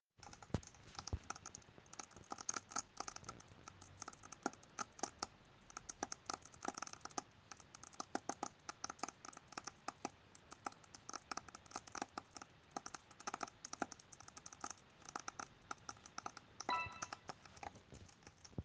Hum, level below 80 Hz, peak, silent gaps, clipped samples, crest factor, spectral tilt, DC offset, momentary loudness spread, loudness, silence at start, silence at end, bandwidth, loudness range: none; -68 dBFS; -24 dBFS; none; under 0.1%; 28 dB; -2.5 dB/octave; under 0.1%; 12 LU; -50 LUFS; 0.2 s; 0 s; 10 kHz; 3 LU